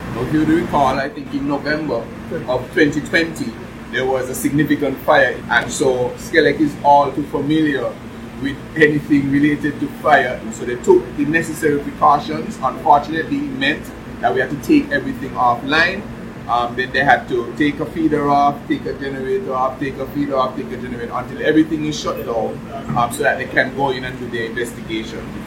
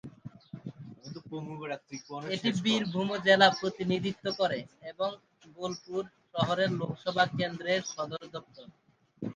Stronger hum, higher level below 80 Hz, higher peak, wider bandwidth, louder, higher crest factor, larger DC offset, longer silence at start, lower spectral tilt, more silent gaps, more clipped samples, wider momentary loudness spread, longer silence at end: neither; first, -42 dBFS vs -70 dBFS; first, 0 dBFS vs -8 dBFS; first, 16.5 kHz vs 9.8 kHz; first, -18 LUFS vs -30 LUFS; second, 18 dB vs 24 dB; neither; about the same, 0 s vs 0.05 s; about the same, -5.5 dB/octave vs -5 dB/octave; neither; neither; second, 11 LU vs 20 LU; about the same, 0 s vs 0 s